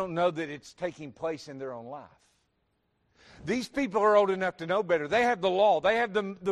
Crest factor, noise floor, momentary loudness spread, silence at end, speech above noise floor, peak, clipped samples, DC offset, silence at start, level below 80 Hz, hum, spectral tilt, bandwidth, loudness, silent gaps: 18 dB; -75 dBFS; 16 LU; 0 s; 47 dB; -10 dBFS; under 0.1%; under 0.1%; 0 s; -64 dBFS; none; -5 dB/octave; 12 kHz; -28 LUFS; none